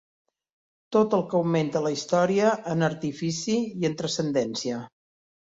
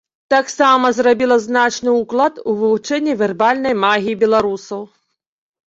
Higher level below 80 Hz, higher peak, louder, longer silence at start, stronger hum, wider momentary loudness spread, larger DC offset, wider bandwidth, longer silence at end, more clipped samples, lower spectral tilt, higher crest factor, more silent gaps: second, -66 dBFS vs -58 dBFS; second, -8 dBFS vs -2 dBFS; second, -25 LUFS vs -15 LUFS; first, 0.9 s vs 0.3 s; neither; about the same, 7 LU vs 6 LU; neither; about the same, 8 kHz vs 8 kHz; second, 0.7 s vs 0.85 s; neither; first, -5.5 dB/octave vs -4 dB/octave; about the same, 18 dB vs 14 dB; neither